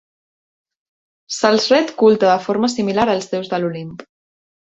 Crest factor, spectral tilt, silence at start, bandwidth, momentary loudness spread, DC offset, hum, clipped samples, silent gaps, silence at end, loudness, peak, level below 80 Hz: 16 dB; -4.5 dB/octave; 1.3 s; 8 kHz; 12 LU; under 0.1%; none; under 0.1%; none; 0.65 s; -16 LUFS; -2 dBFS; -58 dBFS